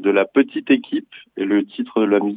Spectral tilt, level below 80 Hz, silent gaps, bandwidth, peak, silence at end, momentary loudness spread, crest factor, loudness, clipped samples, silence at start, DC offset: -8 dB/octave; -78 dBFS; none; 4.6 kHz; -2 dBFS; 0 s; 10 LU; 16 dB; -19 LUFS; under 0.1%; 0 s; under 0.1%